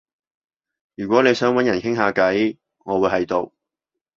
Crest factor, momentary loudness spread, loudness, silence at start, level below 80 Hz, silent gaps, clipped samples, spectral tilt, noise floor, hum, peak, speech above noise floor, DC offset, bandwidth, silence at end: 20 dB; 11 LU; -19 LUFS; 1 s; -56 dBFS; none; under 0.1%; -5.5 dB/octave; -84 dBFS; none; -2 dBFS; 66 dB; under 0.1%; 7.4 kHz; 0.7 s